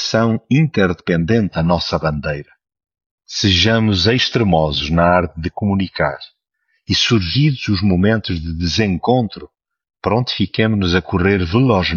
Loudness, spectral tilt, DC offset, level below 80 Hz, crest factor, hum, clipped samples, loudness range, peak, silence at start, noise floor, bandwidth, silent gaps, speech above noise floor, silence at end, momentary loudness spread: -16 LUFS; -6 dB/octave; under 0.1%; -36 dBFS; 16 dB; none; under 0.1%; 2 LU; -2 dBFS; 0 s; -68 dBFS; 7.2 kHz; 3.06-3.18 s; 52 dB; 0 s; 8 LU